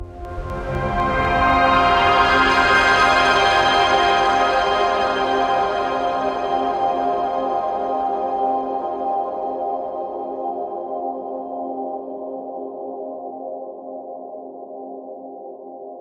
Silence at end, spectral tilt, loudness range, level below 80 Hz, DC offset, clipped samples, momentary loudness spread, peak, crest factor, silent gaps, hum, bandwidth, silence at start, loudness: 0 s; -4 dB/octave; 16 LU; -40 dBFS; under 0.1%; under 0.1%; 19 LU; -2 dBFS; 18 dB; none; none; 12 kHz; 0 s; -19 LUFS